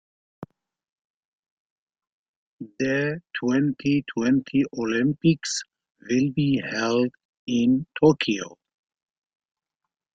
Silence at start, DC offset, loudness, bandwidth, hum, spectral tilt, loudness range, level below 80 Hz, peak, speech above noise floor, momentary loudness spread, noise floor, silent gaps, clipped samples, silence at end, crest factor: 0.4 s; under 0.1%; -24 LUFS; 9.2 kHz; none; -5.5 dB/octave; 6 LU; -62 dBFS; -6 dBFS; 63 dB; 9 LU; -86 dBFS; 0.89-1.43 s, 1.51-1.87 s, 2.12-2.59 s, 5.90-5.95 s, 7.25-7.47 s; under 0.1%; 1.65 s; 20 dB